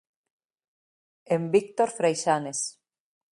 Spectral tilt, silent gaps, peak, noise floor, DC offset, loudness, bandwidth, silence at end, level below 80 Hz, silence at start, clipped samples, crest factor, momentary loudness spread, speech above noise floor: -4.5 dB/octave; none; -8 dBFS; under -90 dBFS; under 0.1%; -26 LUFS; 11.5 kHz; 0.6 s; -72 dBFS; 1.3 s; under 0.1%; 20 dB; 7 LU; over 65 dB